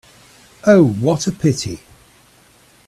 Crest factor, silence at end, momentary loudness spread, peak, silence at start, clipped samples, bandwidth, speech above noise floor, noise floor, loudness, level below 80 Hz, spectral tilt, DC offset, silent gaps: 18 dB; 1.1 s; 14 LU; 0 dBFS; 0.65 s; under 0.1%; 13.5 kHz; 36 dB; -50 dBFS; -16 LUFS; -50 dBFS; -6 dB/octave; under 0.1%; none